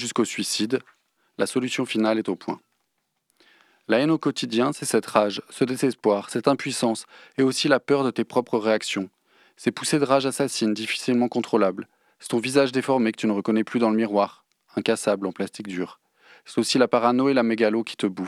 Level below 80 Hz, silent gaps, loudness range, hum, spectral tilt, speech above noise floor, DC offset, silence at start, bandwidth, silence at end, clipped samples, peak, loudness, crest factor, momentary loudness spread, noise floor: -78 dBFS; none; 3 LU; none; -4.5 dB/octave; 52 dB; under 0.1%; 0 s; 14.5 kHz; 0 s; under 0.1%; -2 dBFS; -23 LUFS; 22 dB; 10 LU; -75 dBFS